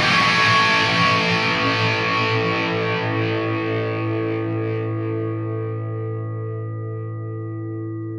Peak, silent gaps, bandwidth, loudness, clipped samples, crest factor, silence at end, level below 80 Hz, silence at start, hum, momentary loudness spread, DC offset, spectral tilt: -4 dBFS; none; 10.5 kHz; -20 LUFS; under 0.1%; 18 dB; 0 s; -56 dBFS; 0 s; none; 14 LU; under 0.1%; -5 dB/octave